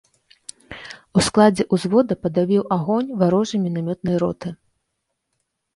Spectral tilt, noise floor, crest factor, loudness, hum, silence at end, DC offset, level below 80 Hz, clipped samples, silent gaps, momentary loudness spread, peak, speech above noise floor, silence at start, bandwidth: -6 dB/octave; -76 dBFS; 18 dB; -19 LUFS; none; 1.2 s; under 0.1%; -52 dBFS; under 0.1%; none; 21 LU; -2 dBFS; 57 dB; 0.7 s; 11.5 kHz